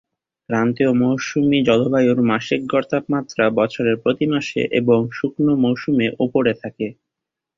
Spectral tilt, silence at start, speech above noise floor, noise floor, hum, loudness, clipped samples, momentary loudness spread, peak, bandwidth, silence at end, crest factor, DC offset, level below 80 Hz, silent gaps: -6.5 dB/octave; 0.5 s; 66 dB; -84 dBFS; none; -19 LUFS; under 0.1%; 6 LU; -2 dBFS; 7.4 kHz; 0.65 s; 16 dB; under 0.1%; -56 dBFS; none